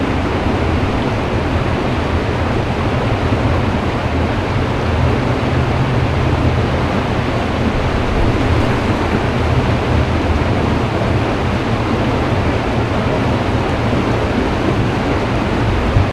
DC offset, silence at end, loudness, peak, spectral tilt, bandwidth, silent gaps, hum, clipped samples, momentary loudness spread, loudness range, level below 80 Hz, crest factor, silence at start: under 0.1%; 0 s; -16 LUFS; 0 dBFS; -7 dB/octave; 12 kHz; none; none; under 0.1%; 2 LU; 1 LU; -24 dBFS; 14 dB; 0 s